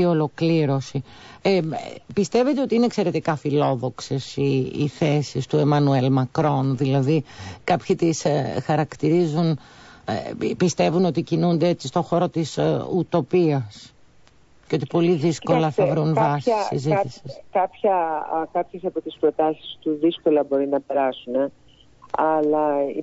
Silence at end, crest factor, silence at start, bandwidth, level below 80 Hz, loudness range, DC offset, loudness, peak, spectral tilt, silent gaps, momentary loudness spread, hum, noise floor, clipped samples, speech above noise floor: 0 s; 14 dB; 0 s; 8 kHz; -58 dBFS; 2 LU; under 0.1%; -22 LUFS; -8 dBFS; -7 dB/octave; none; 9 LU; none; -52 dBFS; under 0.1%; 31 dB